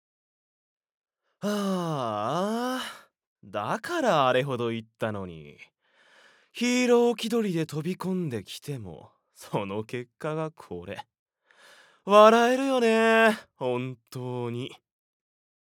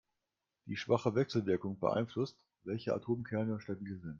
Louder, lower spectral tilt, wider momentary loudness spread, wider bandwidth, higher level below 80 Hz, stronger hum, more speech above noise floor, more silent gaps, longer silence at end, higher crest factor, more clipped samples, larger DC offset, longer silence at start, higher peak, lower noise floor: first, -26 LUFS vs -36 LUFS; second, -5 dB/octave vs -7.5 dB/octave; first, 18 LU vs 10 LU; first, 18 kHz vs 7.4 kHz; about the same, -76 dBFS vs -72 dBFS; neither; second, 35 dB vs 53 dB; first, 3.27-3.36 s, 11.19-11.26 s vs none; first, 0.95 s vs 0 s; about the same, 24 dB vs 22 dB; neither; neither; first, 1.4 s vs 0.65 s; first, -4 dBFS vs -16 dBFS; second, -61 dBFS vs -88 dBFS